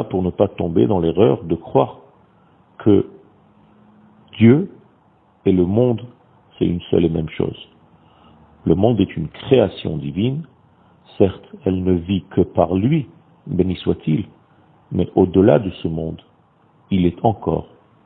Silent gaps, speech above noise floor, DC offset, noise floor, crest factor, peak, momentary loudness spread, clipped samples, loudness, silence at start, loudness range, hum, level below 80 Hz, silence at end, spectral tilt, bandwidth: none; 38 dB; under 0.1%; -55 dBFS; 20 dB; 0 dBFS; 11 LU; under 0.1%; -19 LUFS; 0 s; 2 LU; none; -46 dBFS; 0.4 s; -12 dB/octave; 4.2 kHz